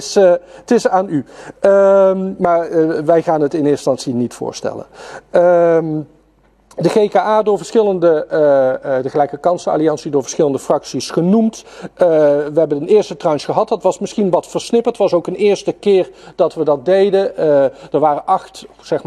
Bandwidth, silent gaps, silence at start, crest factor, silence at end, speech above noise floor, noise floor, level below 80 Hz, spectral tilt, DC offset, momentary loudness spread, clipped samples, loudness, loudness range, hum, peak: 12 kHz; none; 0 s; 14 dB; 0.05 s; 39 dB; -53 dBFS; -56 dBFS; -6 dB/octave; under 0.1%; 10 LU; under 0.1%; -15 LUFS; 2 LU; none; 0 dBFS